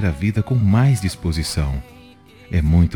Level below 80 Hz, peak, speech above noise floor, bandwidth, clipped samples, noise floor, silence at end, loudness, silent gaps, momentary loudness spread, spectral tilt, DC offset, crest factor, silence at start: -30 dBFS; -4 dBFS; 28 dB; 17.5 kHz; under 0.1%; -45 dBFS; 0 s; -19 LUFS; none; 9 LU; -6.5 dB/octave; under 0.1%; 14 dB; 0 s